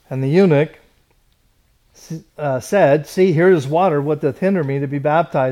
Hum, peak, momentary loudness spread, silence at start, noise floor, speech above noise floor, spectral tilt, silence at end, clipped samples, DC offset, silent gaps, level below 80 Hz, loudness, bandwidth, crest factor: none; -2 dBFS; 11 LU; 0.1 s; -59 dBFS; 43 dB; -7.5 dB/octave; 0 s; under 0.1%; under 0.1%; none; -58 dBFS; -16 LUFS; 14 kHz; 14 dB